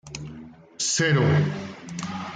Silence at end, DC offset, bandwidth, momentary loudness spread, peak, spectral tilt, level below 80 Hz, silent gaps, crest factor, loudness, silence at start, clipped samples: 0 s; under 0.1%; 9.4 kHz; 18 LU; -10 dBFS; -4.5 dB/octave; -56 dBFS; none; 16 dB; -23 LUFS; 0.05 s; under 0.1%